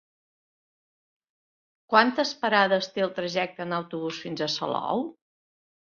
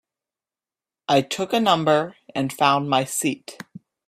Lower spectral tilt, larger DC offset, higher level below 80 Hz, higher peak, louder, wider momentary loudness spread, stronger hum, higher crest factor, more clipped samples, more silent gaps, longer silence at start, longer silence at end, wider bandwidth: about the same, -4.5 dB/octave vs -4 dB/octave; neither; second, -74 dBFS vs -66 dBFS; about the same, -4 dBFS vs -4 dBFS; second, -26 LUFS vs -21 LUFS; second, 11 LU vs 18 LU; neither; first, 26 dB vs 20 dB; neither; neither; first, 1.9 s vs 1.1 s; first, 0.85 s vs 0.5 s; second, 7.2 kHz vs 15.5 kHz